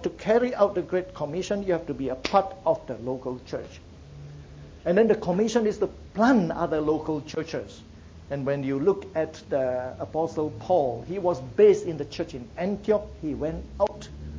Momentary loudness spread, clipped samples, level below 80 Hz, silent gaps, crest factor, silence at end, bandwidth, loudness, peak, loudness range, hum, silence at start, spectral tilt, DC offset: 14 LU; under 0.1%; -48 dBFS; none; 18 dB; 0 s; 7.8 kHz; -26 LUFS; -8 dBFS; 4 LU; none; 0 s; -6.5 dB/octave; under 0.1%